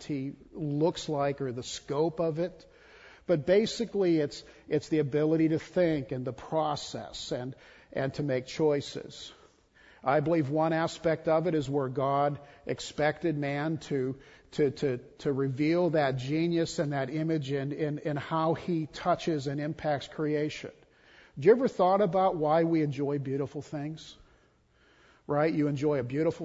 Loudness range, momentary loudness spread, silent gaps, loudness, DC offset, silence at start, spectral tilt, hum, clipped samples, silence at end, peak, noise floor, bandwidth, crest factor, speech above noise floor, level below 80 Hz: 5 LU; 12 LU; none; -30 LUFS; under 0.1%; 0 s; -6.5 dB/octave; none; under 0.1%; 0 s; -10 dBFS; -65 dBFS; 8 kHz; 20 dB; 36 dB; -62 dBFS